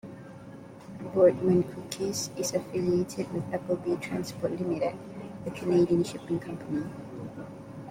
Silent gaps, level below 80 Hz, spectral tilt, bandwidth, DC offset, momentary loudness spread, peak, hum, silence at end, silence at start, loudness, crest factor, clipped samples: none; -62 dBFS; -6 dB/octave; 16 kHz; under 0.1%; 19 LU; -10 dBFS; none; 0 s; 0.05 s; -29 LUFS; 20 dB; under 0.1%